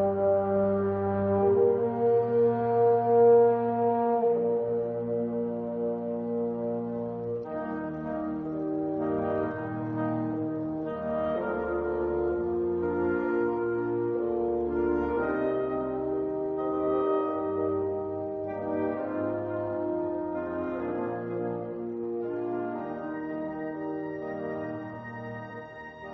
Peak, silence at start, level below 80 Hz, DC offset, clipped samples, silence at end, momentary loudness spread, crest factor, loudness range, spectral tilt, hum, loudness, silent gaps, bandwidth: -12 dBFS; 0 s; -56 dBFS; under 0.1%; under 0.1%; 0 s; 10 LU; 16 dB; 10 LU; -8.5 dB/octave; none; -29 LUFS; none; 4 kHz